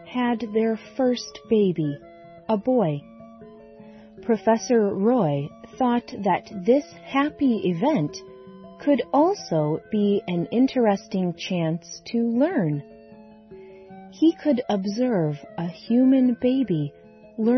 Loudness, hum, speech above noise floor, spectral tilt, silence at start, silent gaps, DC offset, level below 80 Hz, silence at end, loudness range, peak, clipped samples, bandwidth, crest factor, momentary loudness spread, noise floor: -23 LUFS; none; 25 dB; -7 dB/octave; 0 s; none; under 0.1%; -62 dBFS; 0 s; 3 LU; -8 dBFS; under 0.1%; 6.4 kHz; 16 dB; 12 LU; -47 dBFS